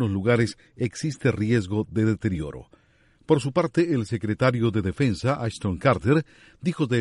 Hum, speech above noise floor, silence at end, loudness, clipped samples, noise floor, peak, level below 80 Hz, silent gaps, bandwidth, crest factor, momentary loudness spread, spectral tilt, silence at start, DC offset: none; 36 dB; 0 s; -24 LUFS; under 0.1%; -60 dBFS; -6 dBFS; -50 dBFS; none; 11.5 kHz; 18 dB; 8 LU; -7 dB/octave; 0 s; under 0.1%